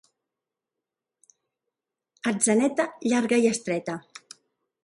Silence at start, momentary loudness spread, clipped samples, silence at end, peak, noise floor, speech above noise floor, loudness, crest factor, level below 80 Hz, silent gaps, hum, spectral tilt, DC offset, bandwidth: 2.25 s; 16 LU; under 0.1%; 0.85 s; -8 dBFS; -87 dBFS; 63 dB; -24 LUFS; 20 dB; -72 dBFS; none; none; -4 dB/octave; under 0.1%; 11.5 kHz